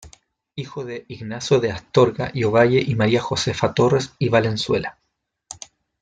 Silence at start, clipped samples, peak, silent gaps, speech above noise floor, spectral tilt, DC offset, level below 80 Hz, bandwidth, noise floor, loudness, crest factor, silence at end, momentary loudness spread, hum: 0 s; under 0.1%; -2 dBFS; none; 55 dB; -5.5 dB/octave; under 0.1%; -52 dBFS; 9.4 kHz; -75 dBFS; -20 LUFS; 18 dB; 0.5 s; 17 LU; none